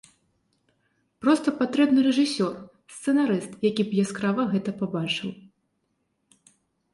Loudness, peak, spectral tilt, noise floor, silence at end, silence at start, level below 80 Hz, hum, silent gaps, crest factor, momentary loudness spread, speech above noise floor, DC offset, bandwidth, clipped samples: -24 LUFS; -8 dBFS; -5.5 dB/octave; -74 dBFS; 1.55 s; 1.2 s; -68 dBFS; none; none; 18 dB; 9 LU; 51 dB; under 0.1%; 11.5 kHz; under 0.1%